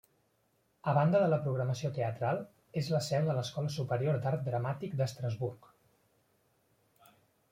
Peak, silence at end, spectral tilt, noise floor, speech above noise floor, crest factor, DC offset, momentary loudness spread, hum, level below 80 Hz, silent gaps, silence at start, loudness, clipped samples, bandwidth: -14 dBFS; 1.95 s; -7 dB/octave; -74 dBFS; 42 dB; 20 dB; under 0.1%; 10 LU; none; -70 dBFS; none; 0.85 s; -33 LUFS; under 0.1%; 16 kHz